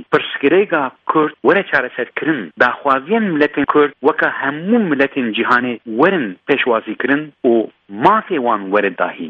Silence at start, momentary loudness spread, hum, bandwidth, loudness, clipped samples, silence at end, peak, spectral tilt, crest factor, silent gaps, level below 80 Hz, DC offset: 0 s; 5 LU; none; 6.8 kHz; -16 LUFS; under 0.1%; 0 s; 0 dBFS; -7.5 dB/octave; 16 dB; none; -60 dBFS; under 0.1%